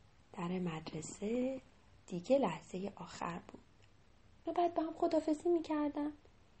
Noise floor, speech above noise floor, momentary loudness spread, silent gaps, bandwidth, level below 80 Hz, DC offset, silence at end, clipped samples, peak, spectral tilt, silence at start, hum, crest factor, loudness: -66 dBFS; 29 dB; 13 LU; none; 8.4 kHz; -68 dBFS; under 0.1%; 0.45 s; under 0.1%; -20 dBFS; -6.5 dB/octave; 0.35 s; none; 18 dB; -38 LUFS